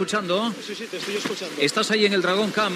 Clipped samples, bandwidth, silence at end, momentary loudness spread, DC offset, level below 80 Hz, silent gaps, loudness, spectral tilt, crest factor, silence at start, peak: under 0.1%; 15.5 kHz; 0 s; 10 LU; under 0.1%; -76 dBFS; none; -23 LUFS; -3.5 dB/octave; 18 dB; 0 s; -6 dBFS